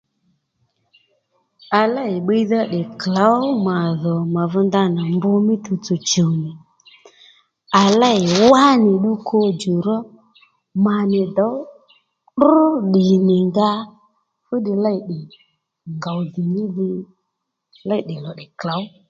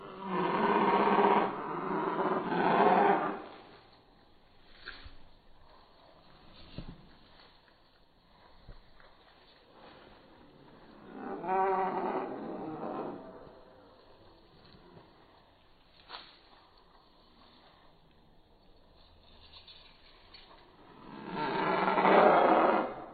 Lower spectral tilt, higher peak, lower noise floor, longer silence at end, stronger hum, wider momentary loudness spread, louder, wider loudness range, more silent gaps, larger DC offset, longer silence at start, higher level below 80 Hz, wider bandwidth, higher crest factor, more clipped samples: first, -6 dB/octave vs -4 dB/octave; first, 0 dBFS vs -8 dBFS; first, -77 dBFS vs -63 dBFS; first, 0.2 s vs 0 s; neither; second, 15 LU vs 26 LU; first, -17 LUFS vs -29 LUFS; second, 9 LU vs 27 LU; neither; neither; first, 1.7 s vs 0 s; about the same, -62 dBFS vs -62 dBFS; first, 7.8 kHz vs 4.8 kHz; second, 18 dB vs 26 dB; neither